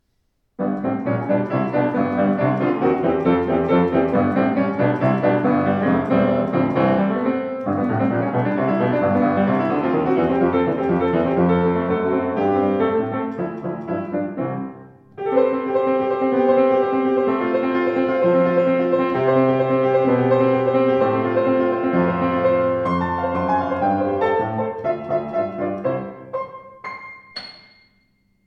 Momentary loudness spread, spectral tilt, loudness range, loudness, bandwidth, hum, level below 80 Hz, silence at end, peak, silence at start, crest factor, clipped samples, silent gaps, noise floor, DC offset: 9 LU; -9.5 dB/octave; 5 LU; -19 LUFS; 5.8 kHz; none; -52 dBFS; 0.95 s; -4 dBFS; 0.6 s; 14 dB; under 0.1%; none; -68 dBFS; under 0.1%